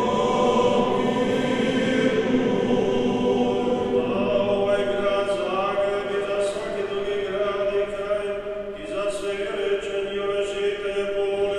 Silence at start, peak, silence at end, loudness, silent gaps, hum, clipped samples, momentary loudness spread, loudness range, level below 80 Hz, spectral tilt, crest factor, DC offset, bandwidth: 0 s; -8 dBFS; 0 s; -23 LUFS; none; none; under 0.1%; 6 LU; 5 LU; -48 dBFS; -5.5 dB/octave; 16 dB; under 0.1%; 11 kHz